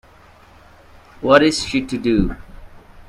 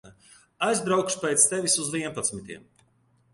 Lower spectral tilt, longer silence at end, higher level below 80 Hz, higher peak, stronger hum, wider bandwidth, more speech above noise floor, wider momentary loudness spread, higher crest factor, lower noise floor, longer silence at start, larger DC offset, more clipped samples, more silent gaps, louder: first, -5 dB/octave vs -2.5 dB/octave; second, 0.05 s vs 0.75 s; first, -36 dBFS vs -64 dBFS; first, 0 dBFS vs -6 dBFS; neither; about the same, 12.5 kHz vs 12 kHz; second, 31 dB vs 39 dB; second, 13 LU vs 18 LU; about the same, 20 dB vs 22 dB; second, -47 dBFS vs -65 dBFS; first, 1.2 s vs 0.05 s; neither; neither; neither; first, -17 LUFS vs -24 LUFS